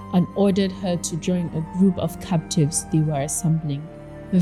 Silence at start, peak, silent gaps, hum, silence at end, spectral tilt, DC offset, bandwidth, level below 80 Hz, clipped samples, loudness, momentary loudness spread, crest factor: 0 s; -8 dBFS; none; none; 0 s; -6 dB/octave; under 0.1%; 13.5 kHz; -48 dBFS; under 0.1%; -22 LUFS; 7 LU; 14 dB